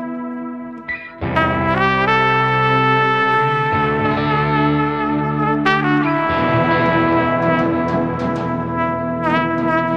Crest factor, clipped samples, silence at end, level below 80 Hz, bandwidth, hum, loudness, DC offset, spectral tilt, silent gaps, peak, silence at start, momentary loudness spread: 16 dB; under 0.1%; 0 s; -42 dBFS; 8.4 kHz; none; -17 LUFS; 0.2%; -7.5 dB/octave; none; 0 dBFS; 0 s; 9 LU